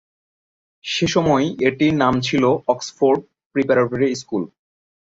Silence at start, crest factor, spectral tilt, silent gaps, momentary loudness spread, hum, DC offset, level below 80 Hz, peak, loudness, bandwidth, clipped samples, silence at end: 0.85 s; 16 dB; -5.5 dB/octave; 3.46-3.50 s; 9 LU; none; under 0.1%; -52 dBFS; -2 dBFS; -19 LUFS; 8 kHz; under 0.1%; 0.6 s